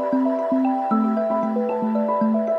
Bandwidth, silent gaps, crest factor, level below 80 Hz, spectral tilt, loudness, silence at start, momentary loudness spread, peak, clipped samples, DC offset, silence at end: 5.2 kHz; none; 12 dB; -76 dBFS; -9.5 dB/octave; -21 LUFS; 0 s; 2 LU; -8 dBFS; under 0.1%; under 0.1%; 0 s